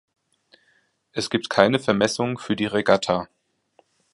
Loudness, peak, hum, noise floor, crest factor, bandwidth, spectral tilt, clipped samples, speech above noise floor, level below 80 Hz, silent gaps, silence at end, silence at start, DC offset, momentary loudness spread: -22 LUFS; 0 dBFS; none; -65 dBFS; 24 dB; 11.5 kHz; -4.5 dB/octave; under 0.1%; 44 dB; -60 dBFS; none; 0.9 s; 1.15 s; under 0.1%; 10 LU